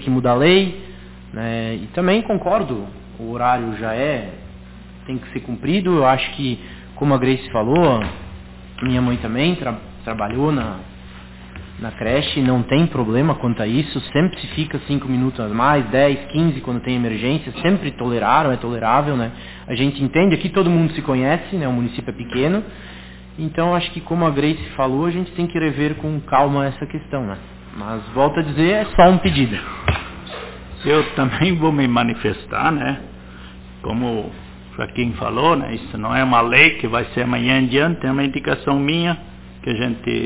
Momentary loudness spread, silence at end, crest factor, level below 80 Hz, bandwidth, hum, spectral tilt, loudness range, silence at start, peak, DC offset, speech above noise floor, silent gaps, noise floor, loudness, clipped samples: 18 LU; 0 s; 18 dB; -40 dBFS; 4 kHz; none; -10.5 dB/octave; 6 LU; 0 s; 0 dBFS; under 0.1%; 20 dB; none; -38 dBFS; -19 LUFS; under 0.1%